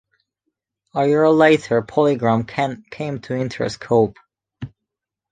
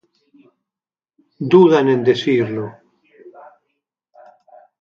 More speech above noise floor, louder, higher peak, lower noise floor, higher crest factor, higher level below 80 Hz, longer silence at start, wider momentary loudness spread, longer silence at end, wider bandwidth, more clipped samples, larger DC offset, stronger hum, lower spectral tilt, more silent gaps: second, 65 dB vs over 76 dB; second, -19 LUFS vs -15 LUFS; about the same, -2 dBFS vs 0 dBFS; second, -83 dBFS vs under -90 dBFS; about the same, 18 dB vs 18 dB; first, -56 dBFS vs -66 dBFS; second, 0.95 s vs 1.4 s; about the same, 16 LU vs 17 LU; second, 0.65 s vs 1.5 s; first, 9.4 kHz vs 7 kHz; neither; neither; neither; about the same, -6.5 dB/octave vs -7.5 dB/octave; neither